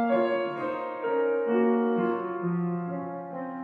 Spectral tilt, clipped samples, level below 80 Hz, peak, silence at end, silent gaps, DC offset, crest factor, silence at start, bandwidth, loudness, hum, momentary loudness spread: -10 dB/octave; under 0.1%; -80 dBFS; -14 dBFS; 0 s; none; under 0.1%; 14 dB; 0 s; 4.8 kHz; -28 LUFS; none; 10 LU